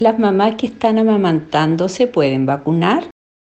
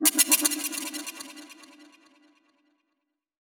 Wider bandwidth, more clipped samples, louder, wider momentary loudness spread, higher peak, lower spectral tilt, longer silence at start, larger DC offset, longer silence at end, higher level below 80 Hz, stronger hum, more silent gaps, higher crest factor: second, 8.6 kHz vs over 20 kHz; neither; first, -16 LUFS vs -23 LUFS; second, 4 LU vs 24 LU; first, 0 dBFS vs -6 dBFS; first, -7 dB/octave vs 1.5 dB/octave; about the same, 0 s vs 0 s; neither; second, 0.5 s vs 1.55 s; first, -56 dBFS vs -82 dBFS; neither; neither; second, 14 dB vs 24 dB